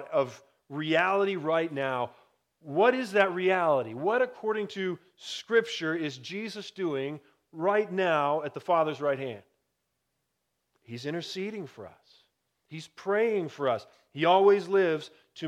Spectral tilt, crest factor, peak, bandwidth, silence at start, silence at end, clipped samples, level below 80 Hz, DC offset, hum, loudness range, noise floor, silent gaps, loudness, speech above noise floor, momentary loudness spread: -5.5 dB/octave; 22 dB; -8 dBFS; 12 kHz; 0 s; 0 s; under 0.1%; -84 dBFS; under 0.1%; none; 10 LU; -81 dBFS; none; -28 LUFS; 52 dB; 16 LU